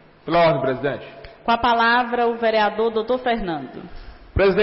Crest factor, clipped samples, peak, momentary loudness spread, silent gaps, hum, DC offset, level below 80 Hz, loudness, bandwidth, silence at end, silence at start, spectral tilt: 12 dB; under 0.1%; -8 dBFS; 14 LU; none; none; under 0.1%; -40 dBFS; -20 LUFS; 5.8 kHz; 0 s; 0.25 s; -10 dB/octave